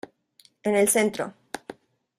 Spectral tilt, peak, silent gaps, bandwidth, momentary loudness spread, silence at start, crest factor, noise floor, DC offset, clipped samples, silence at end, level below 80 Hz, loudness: -3.5 dB/octave; -8 dBFS; none; 15.5 kHz; 22 LU; 0.65 s; 20 dB; -60 dBFS; under 0.1%; under 0.1%; 0.45 s; -68 dBFS; -24 LUFS